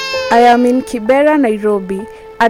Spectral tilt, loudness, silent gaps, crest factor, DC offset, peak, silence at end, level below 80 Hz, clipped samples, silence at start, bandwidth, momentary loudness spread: -5 dB/octave; -11 LUFS; none; 12 dB; under 0.1%; 0 dBFS; 0 s; -46 dBFS; under 0.1%; 0 s; 16 kHz; 14 LU